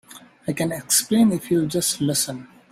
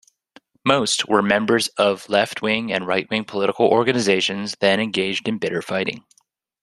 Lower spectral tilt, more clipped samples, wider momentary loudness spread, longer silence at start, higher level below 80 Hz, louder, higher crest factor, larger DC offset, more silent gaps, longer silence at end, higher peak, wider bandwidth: about the same, -4 dB/octave vs -3.5 dB/octave; neither; first, 11 LU vs 7 LU; second, 0.1 s vs 0.65 s; about the same, -58 dBFS vs -62 dBFS; about the same, -21 LUFS vs -20 LUFS; about the same, 18 dB vs 20 dB; neither; neither; second, 0.25 s vs 0.65 s; second, -4 dBFS vs 0 dBFS; first, 16 kHz vs 13 kHz